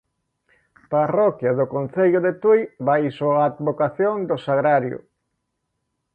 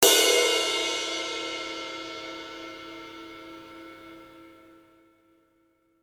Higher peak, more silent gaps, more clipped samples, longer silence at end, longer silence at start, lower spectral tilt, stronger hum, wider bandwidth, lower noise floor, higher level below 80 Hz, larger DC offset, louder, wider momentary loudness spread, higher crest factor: second, -6 dBFS vs -2 dBFS; neither; neither; second, 1.15 s vs 1.5 s; first, 0.9 s vs 0 s; first, -9.5 dB/octave vs 0.5 dB/octave; neither; second, 4.6 kHz vs 19 kHz; first, -76 dBFS vs -67 dBFS; about the same, -66 dBFS vs -68 dBFS; neither; first, -20 LUFS vs -25 LUFS; second, 5 LU vs 25 LU; second, 16 dB vs 26 dB